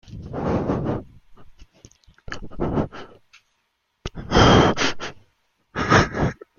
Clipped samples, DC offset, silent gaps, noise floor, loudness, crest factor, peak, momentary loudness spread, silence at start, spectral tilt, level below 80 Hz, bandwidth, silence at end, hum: under 0.1%; under 0.1%; none; -72 dBFS; -20 LUFS; 22 dB; -2 dBFS; 22 LU; 0.1 s; -5.5 dB/octave; -36 dBFS; 7.4 kHz; 0.25 s; none